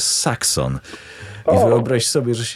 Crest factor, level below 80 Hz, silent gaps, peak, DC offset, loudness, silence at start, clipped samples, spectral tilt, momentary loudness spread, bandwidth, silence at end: 16 dB; -44 dBFS; none; -2 dBFS; under 0.1%; -17 LUFS; 0 s; under 0.1%; -4 dB/octave; 20 LU; 15 kHz; 0 s